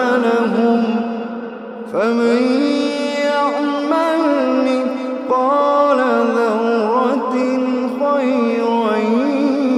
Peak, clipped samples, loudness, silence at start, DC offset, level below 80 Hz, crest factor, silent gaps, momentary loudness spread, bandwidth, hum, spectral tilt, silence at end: -2 dBFS; under 0.1%; -16 LUFS; 0 s; under 0.1%; -70 dBFS; 14 dB; none; 6 LU; 11 kHz; none; -5.5 dB/octave; 0 s